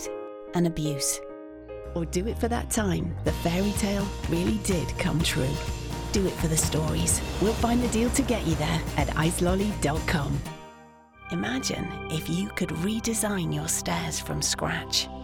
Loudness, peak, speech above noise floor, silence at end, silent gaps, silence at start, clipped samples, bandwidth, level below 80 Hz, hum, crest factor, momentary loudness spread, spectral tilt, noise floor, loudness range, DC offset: -27 LUFS; -10 dBFS; 25 dB; 0 s; none; 0 s; under 0.1%; 18.5 kHz; -38 dBFS; none; 18 dB; 8 LU; -4.5 dB/octave; -51 dBFS; 4 LU; under 0.1%